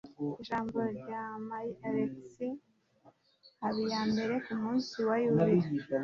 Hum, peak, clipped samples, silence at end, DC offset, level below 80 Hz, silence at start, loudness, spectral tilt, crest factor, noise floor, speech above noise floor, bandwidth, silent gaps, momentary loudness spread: none; -16 dBFS; under 0.1%; 0 s; under 0.1%; -70 dBFS; 0.05 s; -34 LUFS; -7 dB/octave; 18 dB; -65 dBFS; 33 dB; 7.2 kHz; none; 12 LU